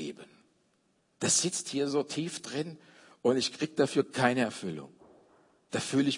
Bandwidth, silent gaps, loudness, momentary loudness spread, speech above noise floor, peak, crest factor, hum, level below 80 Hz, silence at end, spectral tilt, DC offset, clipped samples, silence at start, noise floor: 11 kHz; none; -30 LUFS; 13 LU; 42 dB; -10 dBFS; 22 dB; none; -78 dBFS; 0 s; -3.5 dB/octave; under 0.1%; under 0.1%; 0 s; -72 dBFS